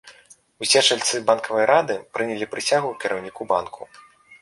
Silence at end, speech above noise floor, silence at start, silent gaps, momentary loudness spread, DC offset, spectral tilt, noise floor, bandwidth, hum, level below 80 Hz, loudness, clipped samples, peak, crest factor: 0.1 s; 30 dB; 0.05 s; none; 12 LU; under 0.1%; -1.5 dB/octave; -52 dBFS; 11.5 kHz; none; -66 dBFS; -21 LUFS; under 0.1%; -2 dBFS; 22 dB